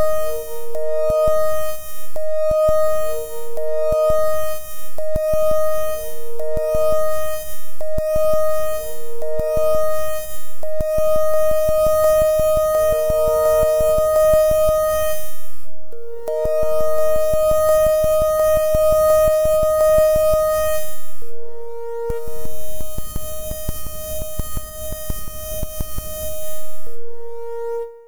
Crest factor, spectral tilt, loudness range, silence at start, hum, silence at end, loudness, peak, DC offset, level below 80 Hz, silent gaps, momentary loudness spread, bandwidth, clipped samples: 10 dB; -4 dB/octave; 13 LU; 0 s; none; 0 s; -19 LUFS; -4 dBFS; under 0.1%; -34 dBFS; none; 17 LU; over 20 kHz; under 0.1%